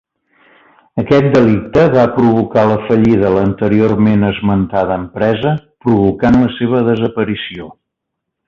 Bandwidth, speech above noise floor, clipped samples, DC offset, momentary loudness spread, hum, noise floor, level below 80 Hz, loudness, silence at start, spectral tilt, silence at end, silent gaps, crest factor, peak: 7.2 kHz; 64 dB; under 0.1%; under 0.1%; 8 LU; none; -76 dBFS; -38 dBFS; -13 LUFS; 0.95 s; -9 dB/octave; 0.75 s; none; 12 dB; 0 dBFS